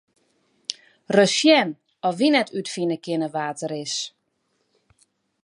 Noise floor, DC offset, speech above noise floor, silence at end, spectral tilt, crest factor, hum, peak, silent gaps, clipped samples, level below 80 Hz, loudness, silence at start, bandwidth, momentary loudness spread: -72 dBFS; under 0.1%; 50 dB; 1.35 s; -3.5 dB/octave; 20 dB; none; -4 dBFS; none; under 0.1%; -78 dBFS; -22 LUFS; 0.7 s; 11 kHz; 17 LU